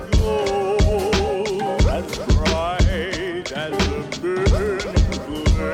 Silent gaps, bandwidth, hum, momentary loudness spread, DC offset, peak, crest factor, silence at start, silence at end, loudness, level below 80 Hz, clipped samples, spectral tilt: none; 15 kHz; none; 6 LU; under 0.1%; -8 dBFS; 12 dB; 0 s; 0 s; -21 LUFS; -24 dBFS; under 0.1%; -5.5 dB/octave